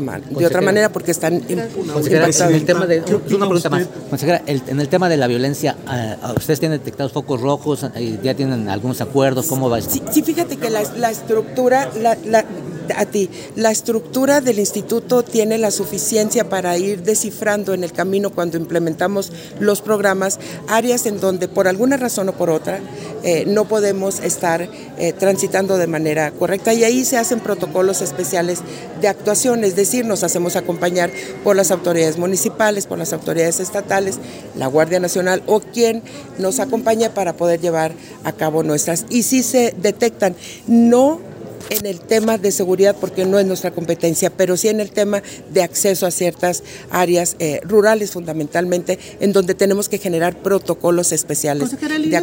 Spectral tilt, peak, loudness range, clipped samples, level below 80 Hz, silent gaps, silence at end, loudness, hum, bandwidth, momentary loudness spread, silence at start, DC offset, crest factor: -4.5 dB/octave; -2 dBFS; 3 LU; under 0.1%; -56 dBFS; none; 0 s; -17 LUFS; none; 16.5 kHz; 7 LU; 0 s; under 0.1%; 16 dB